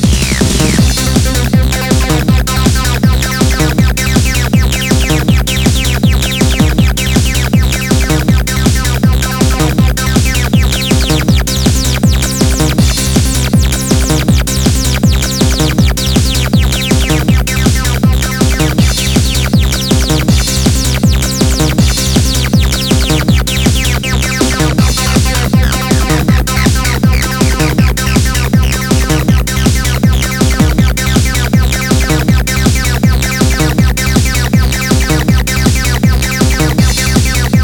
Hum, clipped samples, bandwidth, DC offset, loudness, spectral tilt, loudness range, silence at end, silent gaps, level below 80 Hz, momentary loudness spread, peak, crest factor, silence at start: none; under 0.1%; over 20 kHz; under 0.1%; -11 LUFS; -4.5 dB/octave; 0 LU; 0 s; none; -14 dBFS; 1 LU; 0 dBFS; 10 dB; 0 s